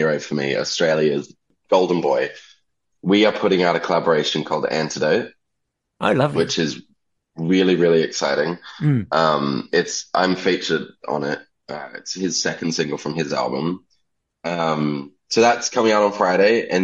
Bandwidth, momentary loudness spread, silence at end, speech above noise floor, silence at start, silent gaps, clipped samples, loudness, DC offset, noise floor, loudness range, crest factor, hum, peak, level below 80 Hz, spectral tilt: 10.5 kHz; 11 LU; 0 s; 57 dB; 0 s; none; under 0.1%; -20 LUFS; under 0.1%; -77 dBFS; 4 LU; 18 dB; none; -2 dBFS; -64 dBFS; -4.5 dB/octave